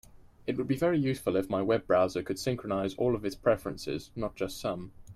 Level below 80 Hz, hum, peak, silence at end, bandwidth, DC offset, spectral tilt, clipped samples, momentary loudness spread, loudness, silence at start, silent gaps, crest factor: -56 dBFS; none; -14 dBFS; 0 s; 15 kHz; under 0.1%; -6.5 dB/octave; under 0.1%; 9 LU; -31 LUFS; 0.2 s; none; 18 dB